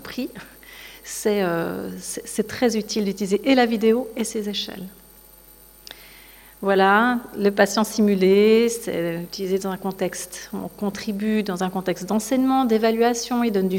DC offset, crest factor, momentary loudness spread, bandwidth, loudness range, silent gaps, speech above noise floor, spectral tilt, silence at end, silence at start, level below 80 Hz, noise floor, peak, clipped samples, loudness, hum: under 0.1%; 18 dB; 16 LU; 17 kHz; 6 LU; none; 27 dB; -4.5 dB/octave; 0 s; 0 s; -56 dBFS; -48 dBFS; -4 dBFS; under 0.1%; -22 LUFS; none